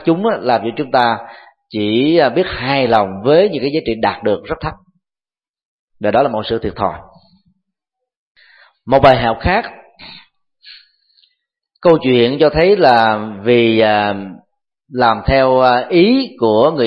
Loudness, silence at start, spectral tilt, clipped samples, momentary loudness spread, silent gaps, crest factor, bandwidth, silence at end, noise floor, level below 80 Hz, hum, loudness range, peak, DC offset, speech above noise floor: -14 LUFS; 0 s; -8 dB/octave; under 0.1%; 10 LU; 5.49-5.54 s, 5.65-5.88 s, 8.16-8.35 s; 14 dB; 5.8 kHz; 0 s; under -90 dBFS; -38 dBFS; none; 8 LU; 0 dBFS; under 0.1%; over 77 dB